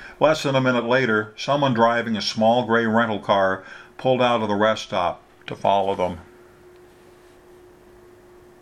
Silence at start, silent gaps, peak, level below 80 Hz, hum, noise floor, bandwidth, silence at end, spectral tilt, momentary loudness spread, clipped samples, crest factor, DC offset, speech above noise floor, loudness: 0 s; none; -2 dBFS; -60 dBFS; none; -49 dBFS; 13.5 kHz; 2.4 s; -5.5 dB/octave; 8 LU; under 0.1%; 20 dB; under 0.1%; 29 dB; -21 LUFS